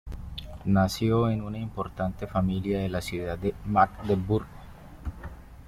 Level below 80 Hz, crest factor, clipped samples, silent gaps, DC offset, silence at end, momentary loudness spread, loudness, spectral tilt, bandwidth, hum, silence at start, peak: -44 dBFS; 20 dB; under 0.1%; none; under 0.1%; 0 s; 17 LU; -28 LUFS; -7 dB/octave; 15.5 kHz; none; 0.05 s; -8 dBFS